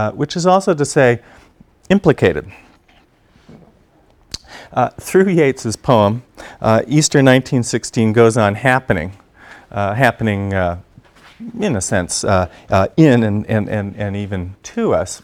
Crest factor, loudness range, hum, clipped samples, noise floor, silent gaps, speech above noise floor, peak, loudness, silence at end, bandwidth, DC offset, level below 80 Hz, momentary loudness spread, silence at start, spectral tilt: 16 dB; 6 LU; none; under 0.1%; -52 dBFS; none; 37 dB; 0 dBFS; -16 LUFS; 0.05 s; 16 kHz; under 0.1%; -44 dBFS; 14 LU; 0 s; -5.5 dB/octave